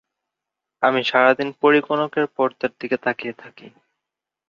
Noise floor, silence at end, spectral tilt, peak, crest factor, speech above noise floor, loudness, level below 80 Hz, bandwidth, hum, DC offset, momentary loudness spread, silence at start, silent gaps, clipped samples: -85 dBFS; 0.8 s; -6 dB/octave; -2 dBFS; 20 dB; 65 dB; -20 LUFS; -70 dBFS; 7 kHz; none; under 0.1%; 11 LU; 0.8 s; none; under 0.1%